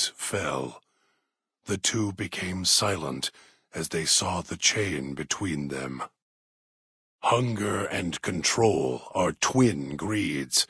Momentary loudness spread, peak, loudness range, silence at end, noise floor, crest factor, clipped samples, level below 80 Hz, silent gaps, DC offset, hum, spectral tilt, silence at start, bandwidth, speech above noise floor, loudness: 11 LU; -8 dBFS; 4 LU; 0.05 s; -79 dBFS; 20 dB; under 0.1%; -58 dBFS; 6.22-7.19 s; under 0.1%; none; -3 dB/octave; 0 s; 11 kHz; 52 dB; -26 LUFS